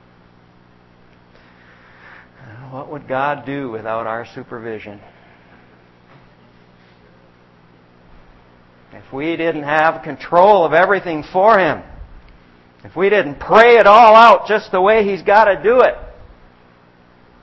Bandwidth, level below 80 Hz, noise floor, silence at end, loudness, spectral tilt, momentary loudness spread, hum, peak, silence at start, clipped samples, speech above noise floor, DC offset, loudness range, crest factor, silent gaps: 8 kHz; -48 dBFS; -49 dBFS; 1.35 s; -13 LUFS; -6 dB/octave; 24 LU; 60 Hz at -55 dBFS; 0 dBFS; 2.55 s; 0.2%; 36 dB; under 0.1%; 18 LU; 16 dB; none